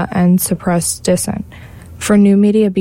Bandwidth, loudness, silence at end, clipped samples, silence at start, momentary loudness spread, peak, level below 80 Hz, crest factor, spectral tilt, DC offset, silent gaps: 16.5 kHz; -13 LUFS; 0 s; under 0.1%; 0 s; 13 LU; -2 dBFS; -42 dBFS; 12 dB; -6 dB/octave; under 0.1%; none